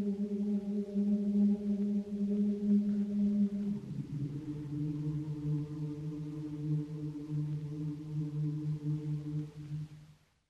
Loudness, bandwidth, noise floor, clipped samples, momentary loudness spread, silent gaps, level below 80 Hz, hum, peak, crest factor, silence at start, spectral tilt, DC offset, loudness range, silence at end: -35 LUFS; 6.6 kHz; -60 dBFS; under 0.1%; 10 LU; none; -64 dBFS; none; -20 dBFS; 14 dB; 0 s; -10 dB/octave; under 0.1%; 6 LU; 0.35 s